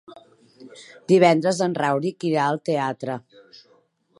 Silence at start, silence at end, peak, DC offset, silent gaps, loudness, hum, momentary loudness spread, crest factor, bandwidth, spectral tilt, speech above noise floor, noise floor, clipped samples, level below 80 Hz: 0.6 s; 1 s; -2 dBFS; under 0.1%; none; -21 LUFS; none; 17 LU; 20 dB; 11.5 kHz; -6 dB/octave; 39 dB; -61 dBFS; under 0.1%; -74 dBFS